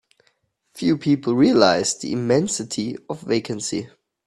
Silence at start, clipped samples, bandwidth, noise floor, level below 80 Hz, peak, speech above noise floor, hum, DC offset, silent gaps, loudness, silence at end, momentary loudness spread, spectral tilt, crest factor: 0.75 s; under 0.1%; 12.5 kHz; -66 dBFS; -60 dBFS; 0 dBFS; 46 dB; none; under 0.1%; none; -21 LUFS; 0.4 s; 13 LU; -4.5 dB/octave; 20 dB